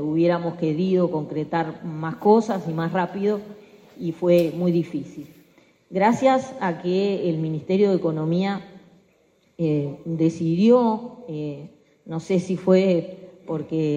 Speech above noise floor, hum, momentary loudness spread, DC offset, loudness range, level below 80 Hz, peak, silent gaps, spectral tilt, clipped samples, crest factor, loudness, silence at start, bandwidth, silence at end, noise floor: 40 dB; none; 14 LU; under 0.1%; 2 LU; -66 dBFS; -4 dBFS; none; -8 dB/octave; under 0.1%; 18 dB; -22 LUFS; 0 s; 15.5 kHz; 0 s; -61 dBFS